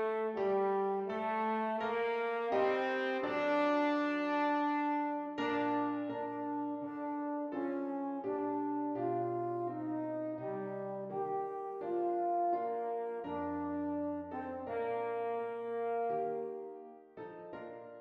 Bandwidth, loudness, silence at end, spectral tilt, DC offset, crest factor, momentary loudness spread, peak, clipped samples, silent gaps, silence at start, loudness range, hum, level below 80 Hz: 6.8 kHz; -36 LUFS; 0 s; -7 dB/octave; under 0.1%; 16 dB; 9 LU; -20 dBFS; under 0.1%; none; 0 s; 5 LU; none; -76 dBFS